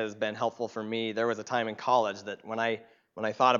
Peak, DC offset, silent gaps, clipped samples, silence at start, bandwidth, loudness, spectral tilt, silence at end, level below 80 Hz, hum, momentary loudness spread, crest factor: -8 dBFS; under 0.1%; none; under 0.1%; 0 s; 7.4 kHz; -31 LUFS; -4.5 dB/octave; 0 s; -82 dBFS; none; 10 LU; 22 dB